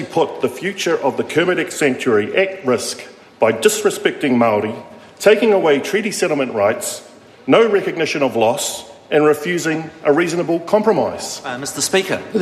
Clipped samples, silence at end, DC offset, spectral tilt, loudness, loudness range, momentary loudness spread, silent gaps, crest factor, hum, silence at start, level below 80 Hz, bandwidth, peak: under 0.1%; 0 s; under 0.1%; -4 dB/octave; -17 LUFS; 2 LU; 10 LU; none; 16 dB; none; 0 s; -64 dBFS; 14 kHz; 0 dBFS